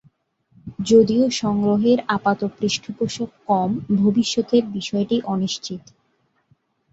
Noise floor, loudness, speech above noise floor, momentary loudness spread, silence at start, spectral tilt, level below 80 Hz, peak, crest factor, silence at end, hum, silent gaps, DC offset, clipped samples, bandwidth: -66 dBFS; -20 LUFS; 47 dB; 12 LU; 0.65 s; -5.5 dB/octave; -58 dBFS; -4 dBFS; 18 dB; 1.15 s; none; none; under 0.1%; under 0.1%; 8 kHz